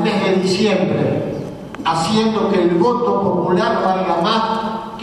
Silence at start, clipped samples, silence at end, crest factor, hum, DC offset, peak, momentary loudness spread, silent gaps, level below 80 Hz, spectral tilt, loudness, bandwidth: 0 s; under 0.1%; 0 s; 14 dB; none; under 0.1%; -4 dBFS; 7 LU; none; -50 dBFS; -6 dB/octave; -17 LUFS; 12.5 kHz